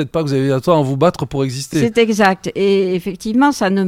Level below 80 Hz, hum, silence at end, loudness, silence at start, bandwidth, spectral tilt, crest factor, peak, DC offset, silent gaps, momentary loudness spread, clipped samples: -46 dBFS; none; 0 s; -16 LUFS; 0 s; 16 kHz; -6 dB/octave; 16 dB; 0 dBFS; under 0.1%; none; 7 LU; under 0.1%